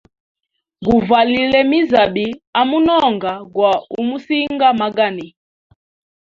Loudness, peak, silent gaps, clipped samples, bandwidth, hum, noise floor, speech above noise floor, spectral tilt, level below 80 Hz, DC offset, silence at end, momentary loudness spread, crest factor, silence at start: -15 LUFS; 0 dBFS; 2.47-2.53 s; under 0.1%; 7.2 kHz; none; -37 dBFS; 22 dB; -6.5 dB/octave; -50 dBFS; under 0.1%; 0.95 s; 9 LU; 16 dB; 0.8 s